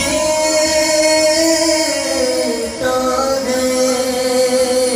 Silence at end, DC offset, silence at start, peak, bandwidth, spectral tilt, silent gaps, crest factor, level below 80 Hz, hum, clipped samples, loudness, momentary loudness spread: 0 s; under 0.1%; 0 s; -2 dBFS; 15.5 kHz; -2 dB/octave; none; 12 dB; -42 dBFS; none; under 0.1%; -14 LUFS; 5 LU